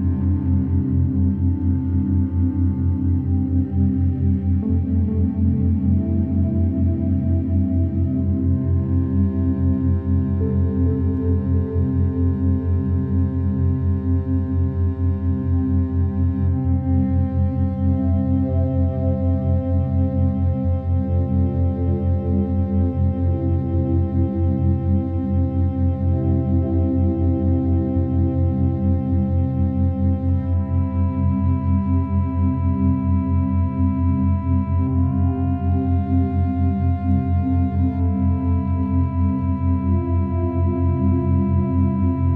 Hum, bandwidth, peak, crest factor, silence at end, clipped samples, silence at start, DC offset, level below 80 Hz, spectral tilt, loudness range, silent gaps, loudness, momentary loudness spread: none; 2.6 kHz; -8 dBFS; 10 dB; 0 s; under 0.1%; 0 s; under 0.1%; -30 dBFS; -13.5 dB/octave; 1 LU; none; -20 LUFS; 2 LU